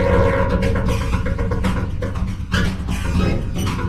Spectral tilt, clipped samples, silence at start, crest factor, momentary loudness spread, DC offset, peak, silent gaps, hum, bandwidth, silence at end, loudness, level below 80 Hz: -6.5 dB/octave; under 0.1%; 0 s; 16 dB; 7 LU; under 0.1%; -2 dBFS; none; none; 13.5 kHz; 0 s; -21 LUFS; -24 dBFS